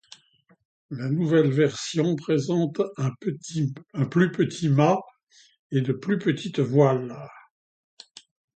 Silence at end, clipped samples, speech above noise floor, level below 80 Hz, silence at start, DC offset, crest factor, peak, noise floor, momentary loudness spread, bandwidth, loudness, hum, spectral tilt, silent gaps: 1.15 s; under 0.1%; 38 dB; -66 dBFS; 0.9 s; under 0.1%; 18 dB; -6 dBFS; -61 dBFS; 10 LU; 9 kHz; -24 LUFS; none; -7 dB/octave; 5.23-5.27 s, 5.59-5.70 s